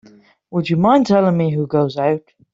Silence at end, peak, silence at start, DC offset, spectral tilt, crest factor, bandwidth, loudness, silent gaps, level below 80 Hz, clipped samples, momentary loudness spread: 0.35 s; -2 dBFS; 0.5 s; under 0.1%; -8 dB/octave; 14 dB; 7.6 kHz; -17 LUFS; none; -56 dBFS; under 0.1%; 10 LU